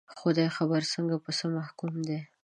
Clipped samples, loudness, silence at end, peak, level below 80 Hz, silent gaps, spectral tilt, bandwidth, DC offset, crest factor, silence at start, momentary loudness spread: under 0.1%; -30 LUFS; 0.2 s; -12 dBFS; -80 dBFS; none; -5.5 dB/octave; 10 kHz; under 0.1%; 18 dB; 0.1 s; 8 LU